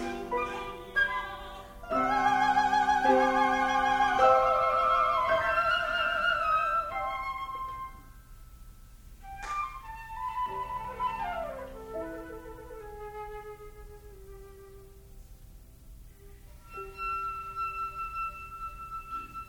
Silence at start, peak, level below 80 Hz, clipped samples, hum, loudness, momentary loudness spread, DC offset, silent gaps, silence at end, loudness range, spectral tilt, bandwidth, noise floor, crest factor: 0 s; -12 dBFS; -50 dBFS; under 0.1%; none; -29 LUFS; 20 LU; under 0.1%; none; 0 s; 20 LU; -4 dB/octave; 19 kHz; -51 dBFS; 20 dB